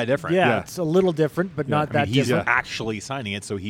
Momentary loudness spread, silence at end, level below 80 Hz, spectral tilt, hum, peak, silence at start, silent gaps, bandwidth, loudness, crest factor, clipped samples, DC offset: 9 LU; 0 s; -56 dBFS; -5.5 dB/octave; none; -4 dBFS; 0 s; none; 17 kHz; -22 LUFS; 20 dB; under 0.1%; under 0.1%